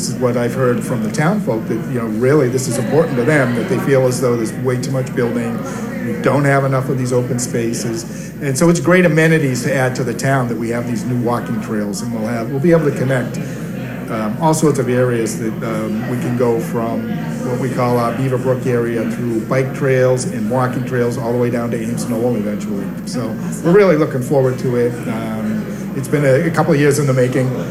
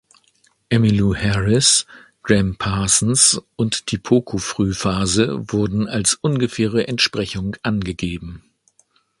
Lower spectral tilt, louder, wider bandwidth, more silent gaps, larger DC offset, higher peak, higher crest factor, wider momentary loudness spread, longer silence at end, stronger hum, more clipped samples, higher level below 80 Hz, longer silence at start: first, -6.5 dB/octave vs -4 dB/octave; about the same, -17 LUFS vs -18 LUFS; first, 15.5 kHz vs 11.5 kHz; neither; neither; about the same, -2 dBFS vs 0 dBFS; about the same, 14 dB vs 18 dB; second, 8 LU vs 11 LU; second, 0 s vs 0.8 s; neither; neither; second, -46 dBFS vs -40 dBFS; second, 0 s vs 0.7 s